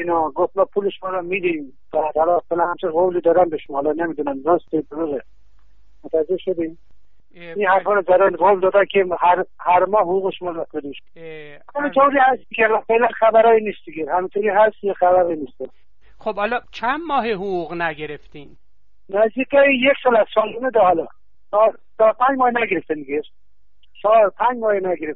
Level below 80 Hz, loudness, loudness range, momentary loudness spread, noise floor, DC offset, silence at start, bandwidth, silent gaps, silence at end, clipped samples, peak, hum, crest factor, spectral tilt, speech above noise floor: -56 dBFS; -18 LUFS; 6 LU; 13 LU; -63 dBFS; 1%; 0 s; 5.4 kHz; none; 0 s; under 0.1%; -4 dBFS; none; 16 dB; -7.5 dB/octave; 44 dB